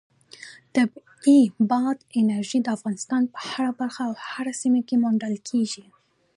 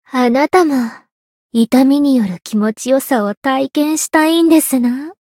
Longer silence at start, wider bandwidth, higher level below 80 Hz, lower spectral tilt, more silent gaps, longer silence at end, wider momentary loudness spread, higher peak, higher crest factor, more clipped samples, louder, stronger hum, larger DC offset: first, 0.4 s vs 0.15 s; second, 11.5 kHz vs 17 kHz; second, -76 dBFS vs -60 dBFS; about the same, -5 dB/octave vs -4 dB/octave; second, none vs 1.12-1.49 s, 3.37-3.42 s; first, 0.6 s vs 0.15 s; first, 12 LU vs 7 LU; second, -8 dBFS vs 0 dBFS; about the same, 16 dB vs 14 dB; neither; second, -24 LUFS vs -14 LUFS; neither; neither